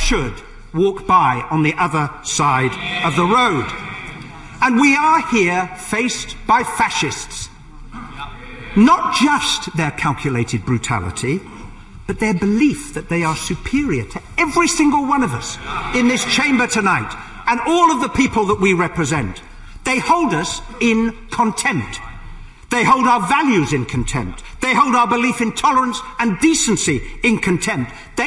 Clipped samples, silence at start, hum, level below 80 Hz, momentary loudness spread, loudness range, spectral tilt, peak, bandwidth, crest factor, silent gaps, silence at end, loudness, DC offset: under 0.1%; 0 s; none; -36 dBFS; 14 LU; 4 LU; -4 dB/octave; -2 dBFS; 11.5 kHz; 16 dB; none; 0 s; -17 LUFS; under 0.1%